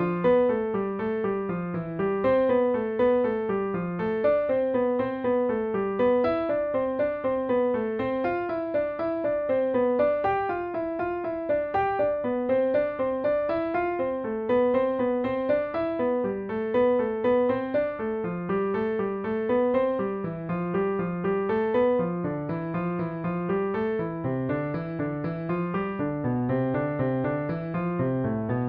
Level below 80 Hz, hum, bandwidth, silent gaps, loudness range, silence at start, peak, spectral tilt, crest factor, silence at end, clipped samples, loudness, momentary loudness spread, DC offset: -56 dBFS; none; 5 kHz; none; 3 LU; 0 s; -12 dBFS; -7 dB/octave; 14 dB; 0 s; under 0.1%; -26 LUFS; 6 LU; under 0.1%